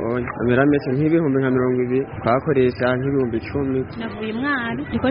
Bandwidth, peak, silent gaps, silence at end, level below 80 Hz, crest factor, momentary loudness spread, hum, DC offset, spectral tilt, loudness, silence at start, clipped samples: 5.4 kHz; -2 dBFS; none; 0 s; -46 dBFS; 18 dB; 7 LU; none; under 0.1%; -6.5 dB/octave; -20 LUFS; 0 s; under 0.1%